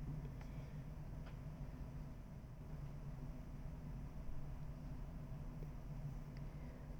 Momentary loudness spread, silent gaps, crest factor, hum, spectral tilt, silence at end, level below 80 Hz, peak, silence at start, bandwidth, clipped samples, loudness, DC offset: 3 LU; none; 14 dB; none; -8 dB/octave; 0 s; -52 dBFS; -36 dBFS; 0 s; over 20 kHz; under 0.1%; -52 LUFS; under 0.1%